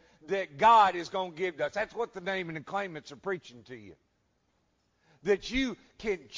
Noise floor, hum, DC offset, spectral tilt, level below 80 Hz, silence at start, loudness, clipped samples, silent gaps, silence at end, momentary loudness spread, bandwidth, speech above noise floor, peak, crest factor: -74 dBFS; none; under 0.1%; -4.5 dB/octave; -58 dBFS; 0.3 s; -30 LUFS; under 0.1%; none; 0 s; 17 LU; 7.6 kHz; 44 dB; -12 dBFS; 20 dB